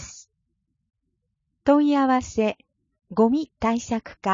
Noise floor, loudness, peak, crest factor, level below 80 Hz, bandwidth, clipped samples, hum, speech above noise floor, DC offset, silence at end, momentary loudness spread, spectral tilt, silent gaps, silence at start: -76 dBFS; -23 LUFS; -6 dBFS; 18 dB; -52 dBFS; 7.6 kHz; under 0.1%; none; 55 dB; under 0.1%; 0 s; 11 LU; -5.5 dB/octave; none; 0 s